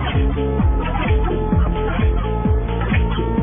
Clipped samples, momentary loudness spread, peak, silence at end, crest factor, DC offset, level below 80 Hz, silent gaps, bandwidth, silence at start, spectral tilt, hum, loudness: under 0.1%; 1 LU; -6 dBFS; 0 s; 12 dB; under 0.1%; -20 dBFS; none; 3.7 kHz; 0 s; -11.5 dB/octave; none; -19 LUFS